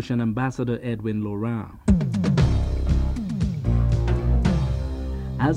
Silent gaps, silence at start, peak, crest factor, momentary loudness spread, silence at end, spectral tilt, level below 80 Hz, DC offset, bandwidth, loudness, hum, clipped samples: none; 0 s; -6 dBFS; 16 dB; 7 LU; 0 s; -8 dB/octave; -26 dBFS; under 0.1%; 9.2 kHz; -24 LUFS; none; under 0.1%